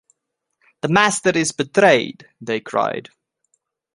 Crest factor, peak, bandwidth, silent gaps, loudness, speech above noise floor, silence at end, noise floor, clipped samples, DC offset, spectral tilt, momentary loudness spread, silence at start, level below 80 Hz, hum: 20 dB; -2 dBFS; 11.5 kHz; none; -18 LUFS; 59 dB; 0.95 s; -77 dBFS; under 0.1%; under 0.1%; -4 dB/octave; 15 LU; 0.85 s; -60 dBFS; none